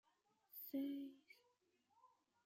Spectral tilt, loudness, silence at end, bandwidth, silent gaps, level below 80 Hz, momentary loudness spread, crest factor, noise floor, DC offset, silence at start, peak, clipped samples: -5 dB/octave; -50 LUFS; 0.4 s; 16 kHz; none; under -90 dBFS; 22 LU; 18 dB; -83 dBFS; under 0.1%; 0.55 s; -36 dBFS; under 0.1%